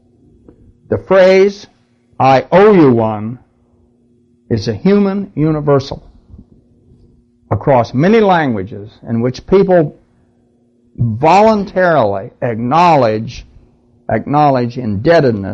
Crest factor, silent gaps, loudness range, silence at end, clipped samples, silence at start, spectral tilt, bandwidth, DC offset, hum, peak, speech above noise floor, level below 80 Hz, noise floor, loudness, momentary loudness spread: 12 dB; none; 5 LU; 0 s; under 0.1%; 0.9 s; -7.5 dB/octave; 8 kHz; under 0.1%; none; -2 dBFS; 42 dB; -42 dBFS; -54 dBFS; -12 LUFS; 14 LU